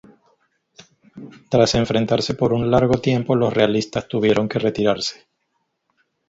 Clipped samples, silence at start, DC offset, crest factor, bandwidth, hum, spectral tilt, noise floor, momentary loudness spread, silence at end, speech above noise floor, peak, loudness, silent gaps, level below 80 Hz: under 0.1%; 1.15 s; under 0.1%; 20 dB; 8 kHz; none; -6 dB/octave; -72 dBFS; 5 LU; 1.15 s; 54 dB; 0 dBFS; -19 LUFS; none; -46 dBFS